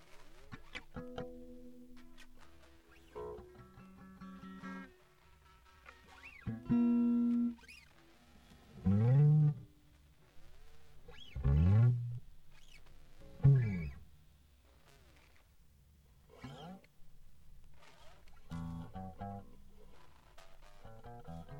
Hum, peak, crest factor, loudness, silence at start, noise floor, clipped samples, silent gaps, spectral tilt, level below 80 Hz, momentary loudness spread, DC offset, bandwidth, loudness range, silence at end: none; -16 dBFS; 22 dB; -34 LUFS; 0.15 s; -65 dBFS; under 0.1%; none; -9.5 dB/octave; -52 dBFS; 28 LU; under 0.1%; 7.2 kHz; 21 LU; 0 s